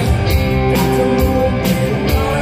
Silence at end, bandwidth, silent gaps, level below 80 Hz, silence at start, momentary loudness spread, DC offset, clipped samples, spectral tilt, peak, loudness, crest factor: 0 s; 15.5 kHz; none; -22 dBFS; 0 s; 2 LU; under 0.1%; under 0.1%; -6.5 dB/octave; -2 dBFS; -15 LUFS; 12 dB